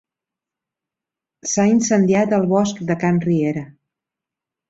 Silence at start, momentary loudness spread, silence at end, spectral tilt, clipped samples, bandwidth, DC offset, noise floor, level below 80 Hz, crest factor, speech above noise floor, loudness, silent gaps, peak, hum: 1.45 s; 8 LU; 1 s; -6 dB/octave; under 0.1%; 8 kHz; under 0.1%; -87 dBFS; -58 dBFS; 16 dB; 70 dB; -18 LUFS; none; -4 dBFS; none